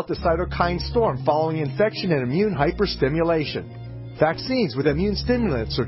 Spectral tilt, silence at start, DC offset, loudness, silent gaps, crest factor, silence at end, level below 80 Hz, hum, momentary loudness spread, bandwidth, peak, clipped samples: -10 dB/octave; 0 s; under 0.1%; -22 LUFS; none; 16 dB; 0 s; -36 dBFS; none; 3 LU; 5.8 kHz; -6 dBFS; under 0.1%